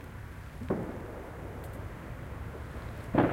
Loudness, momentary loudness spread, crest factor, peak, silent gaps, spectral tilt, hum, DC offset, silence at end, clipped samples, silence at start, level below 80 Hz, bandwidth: -38 LUFS; 10 LU; 24 dB; -12 dBFS; none; -8 dB/octave; none; under 0.1%; 0 s; under 0.1%; 0 s; -46 dBFS; 16.5 kHz